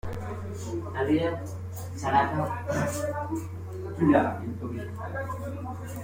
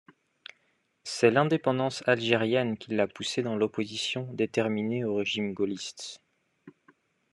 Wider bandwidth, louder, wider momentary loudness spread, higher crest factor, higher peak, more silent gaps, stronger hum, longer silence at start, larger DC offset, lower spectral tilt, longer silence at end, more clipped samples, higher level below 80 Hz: first, 16.5 kHz vs 11.5 kHz; about the same, -29 LUFS vs -28 LUFS; second, 13 LU vs 16 LU; about the same, 20 dB vs 22 dB; about the same, -10 dBFS vs -8 dBFS; neither; neither; second, 0.05 s vs 1.05 s; neither; first, -6.5 dB/octave vs -5 dB/octave; second, 0 s vs 0.65 s; neither; first, -52 dBFS vs -76 dBFS